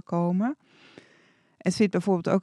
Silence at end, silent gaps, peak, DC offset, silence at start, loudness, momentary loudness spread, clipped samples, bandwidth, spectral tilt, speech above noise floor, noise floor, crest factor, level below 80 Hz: 0 s; none; -10 dBFS; under 0.1%; 0.1 s; -26 LUFS; 7 LU; under 0.1%; 11 kHz; -7 dB/octave; 36 dB; -61 dBFS; 16 dB; -70 dBFS